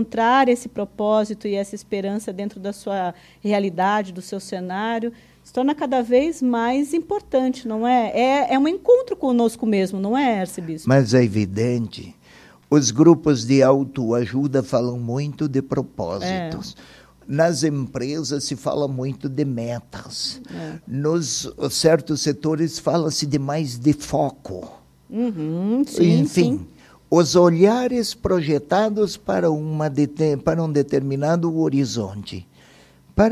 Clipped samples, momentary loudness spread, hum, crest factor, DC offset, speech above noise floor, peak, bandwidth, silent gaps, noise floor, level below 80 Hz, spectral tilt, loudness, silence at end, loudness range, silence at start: under 0.1%; 13 LU; none; 20 dB; under 0.1%; 30 dB; 0 dBFS; 14 kHz; none; -50 dBFS; -48 dBFS; -5.5 dB/octave; -21 LUFS; 0 s; 6 LU; 0 s